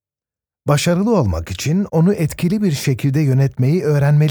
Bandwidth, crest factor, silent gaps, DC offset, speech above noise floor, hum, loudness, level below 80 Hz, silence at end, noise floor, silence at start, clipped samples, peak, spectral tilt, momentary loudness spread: over 20 kHz; 14 dB; none; under 0.1%; over 75 dB; none; -17 LUFS; -40 dBFS; 0 s; under -90 dBFS; 0.65 s; under 0.1%; -2 dBFS; -7 dB/octave; 4 LU